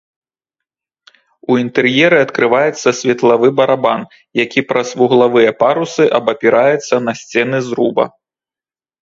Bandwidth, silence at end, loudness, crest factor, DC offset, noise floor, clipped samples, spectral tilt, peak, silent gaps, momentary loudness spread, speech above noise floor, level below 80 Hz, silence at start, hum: 7.8 kHz; 0.95 s; -13 LUFS; 14 dB; under 0.1%; under -90 dBFS; under 0.1%; -5 dB/octave; 0 dBFS; none; 7 LU; over 77 dB; -60 dBFS; 1.5 s; none